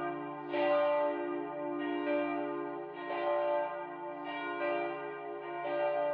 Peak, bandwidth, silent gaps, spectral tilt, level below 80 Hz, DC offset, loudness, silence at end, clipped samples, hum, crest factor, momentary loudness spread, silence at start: -20 dBFS; 5 kHz; none; -3 dB/octave; under -90 dBFS; under 0.1%; -35 LUFS; 0 s; under 0.1%; none; 16 dB; 10 LU; 0 s